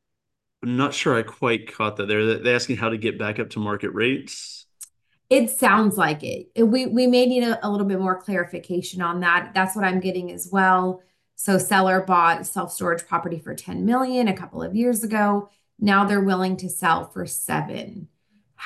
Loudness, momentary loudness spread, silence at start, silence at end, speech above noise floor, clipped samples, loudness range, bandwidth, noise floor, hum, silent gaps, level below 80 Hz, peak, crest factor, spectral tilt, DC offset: -22 LUFS; 11 LU; 0.6 s; 0 s; 60 dB; under 0.1%; 3 LU; 13 kHz; -82 dBFS; none; none; -62 dBFS; -4 dBFS; 18 dB; -4.5 dB/octave; under 0.1%